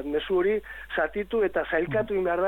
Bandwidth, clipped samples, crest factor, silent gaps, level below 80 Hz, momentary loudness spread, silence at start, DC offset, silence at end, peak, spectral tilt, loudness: 14.5 kHz; under 0.1%; 14 dB; none; -50 dBFS; 4 LU; 0 s; under 0.1%; 0 s; -12 dBFS; -7.5 dB/octave; -27 LUFS